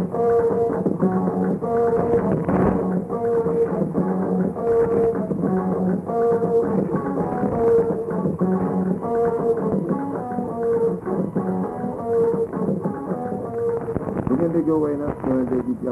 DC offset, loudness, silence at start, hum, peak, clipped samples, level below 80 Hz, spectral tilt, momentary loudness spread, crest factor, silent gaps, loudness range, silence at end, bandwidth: under 0.1%; -22 LUFS; 0 s; none; -6 dBFS; under 0.1%; -48 dBFS; -10.5 dB/octave; 6 LU; 14 dB; none; 3 LU; 0 s; 11 kHz